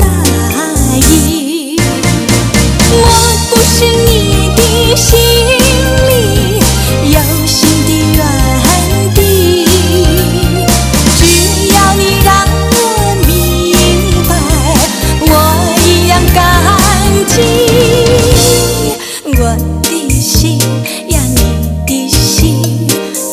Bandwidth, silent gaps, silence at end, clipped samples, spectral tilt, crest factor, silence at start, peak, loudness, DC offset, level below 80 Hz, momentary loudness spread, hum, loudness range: over 20 kHz; none; 0 s; 1%; -4 dB/octave; 8 dB; 0 s; 0 dBFS; -8 LUFS; under 0.1%; -16 dBFS; 5 LU; none; 3 LU